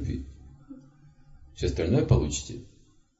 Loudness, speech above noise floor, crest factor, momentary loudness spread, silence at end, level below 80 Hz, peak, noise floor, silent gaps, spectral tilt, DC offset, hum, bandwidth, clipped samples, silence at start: -27 LUFS; 29 dB; 22 dB; 26 LU; 0.55 s; -40 dBFS; -8 dBFS; -54 dBFS; none; -6 dB/octave; under 0.1%; none; 8 kHz; under 0.1%; 0 s